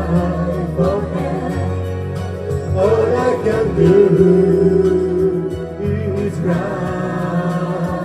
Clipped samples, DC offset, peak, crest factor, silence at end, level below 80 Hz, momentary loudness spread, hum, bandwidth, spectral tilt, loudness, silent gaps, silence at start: under 0.1%; under 0.1%; 0 dBFS; 16 dB; 0 s; -36 dBFS; 11 LU; none; 11 kHz; -8.5 dB/octave; -17 LUFS; none; 0 s